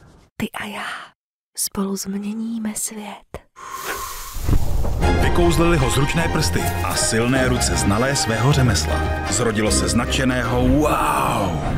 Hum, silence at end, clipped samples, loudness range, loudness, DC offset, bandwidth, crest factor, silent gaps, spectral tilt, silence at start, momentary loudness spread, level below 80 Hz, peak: none; 0 s; under 0.1%; 8 LU; -20 LUFS; under 0.1%; 16 kHz; 16 dB; 1.15-1.53 s; -4.5 dB/octave; 0.4 s; 13 LU; -26 dBFS; -4 dBFS